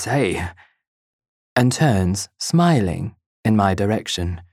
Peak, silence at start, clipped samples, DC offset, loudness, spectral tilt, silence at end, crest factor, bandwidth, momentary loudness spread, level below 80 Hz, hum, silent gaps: -2 dBFS; 0 s; under 0.1%; under 0.1%; -20 LUFS; -5.5 dB/octave; 0.1 s; 18 dB; 15 kHz; 10 LU; -44 dBFS; none; 0.87-1.19 s, 1.28-1.56 s, 3.26-3.43 s